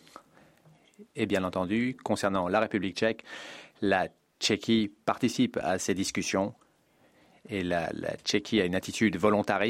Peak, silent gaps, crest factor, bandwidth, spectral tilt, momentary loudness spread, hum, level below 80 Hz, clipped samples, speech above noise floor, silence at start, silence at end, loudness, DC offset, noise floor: -10 dBFS; none; 20 dB; 16 kHz; -4.5 dB/octave; 8 LU; none; -64 dBFS; under 0.1%; 36 dB; 0.15 s; 0 s; -29 LUFS; under 0.1%; -65 dBFS